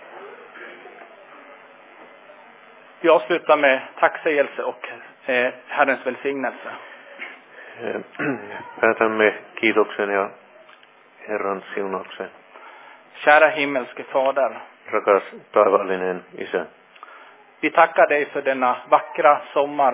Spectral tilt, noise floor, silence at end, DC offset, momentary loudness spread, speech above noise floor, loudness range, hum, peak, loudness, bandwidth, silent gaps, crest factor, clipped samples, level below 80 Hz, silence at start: -8 dB/octave; -50 dBFS; 0 s; under 0.1%; 19 LU; 30 dB; 6 LU; none; 0 dBFS; -20 LUFS; 4 kHz; none; 22 dB; under 0.1%; -74 dBFS; 0.05 s